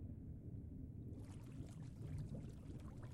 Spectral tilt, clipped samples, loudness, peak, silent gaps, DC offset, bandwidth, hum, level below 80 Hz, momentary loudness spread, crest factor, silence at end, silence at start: -8 dB/octave; under 0.1%; -53 LUFS; -38 dBFS; none; under 0.1%; 13.5 kHz; none; -60 dBFS; 4 LU; 12 dB; 0 s; 0 s